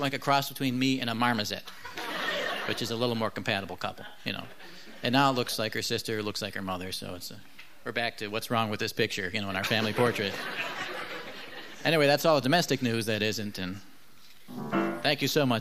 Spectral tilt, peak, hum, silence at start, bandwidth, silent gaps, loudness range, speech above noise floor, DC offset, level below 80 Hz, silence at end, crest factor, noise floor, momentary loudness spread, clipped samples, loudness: -4.5 dB/octave; -10 dBFS; none; 0 s; 15.5 kHz; none; 5 LU; 28 dB; 0.5%; -68 dBFS; 0 s; 20 dB; -57 dBFS; 15 LU; under 0.1%; -29 LUFS